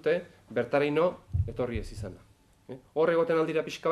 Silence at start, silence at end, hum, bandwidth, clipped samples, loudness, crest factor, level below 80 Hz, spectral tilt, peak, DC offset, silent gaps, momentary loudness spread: 0.05 s; 0 s; none; 12.5 kHz; under 0.1%; -29 LUFS; 16 dB; -46 dBFS; -7 dB/octave; -14 dBFS; under 0.1%; none; 16 LU